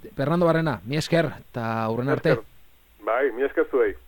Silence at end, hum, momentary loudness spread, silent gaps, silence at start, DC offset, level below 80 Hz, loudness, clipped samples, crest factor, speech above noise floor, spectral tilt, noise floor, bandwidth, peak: 0.1 s; none; 7 LU; none; 0.05 s; under 0.1%; -52 dBFS; -24 LUFS; under 0.1%; 18 dB; 30 dB; -7 dB/octave; -53 dBFS; 17.5 kHz; -6 dBFS